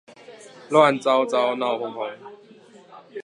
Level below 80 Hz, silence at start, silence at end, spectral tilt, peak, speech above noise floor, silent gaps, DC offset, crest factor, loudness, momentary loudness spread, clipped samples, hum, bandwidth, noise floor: -82 dBFS; 0.3 s; 0 s; -5 dB/octave; -2 dBFS; 28 dB; none; under 0.1%; 20 dB; -21 LUFS; 17 LU; under 0.1%; none; 11.5 kHz; -49 dBFS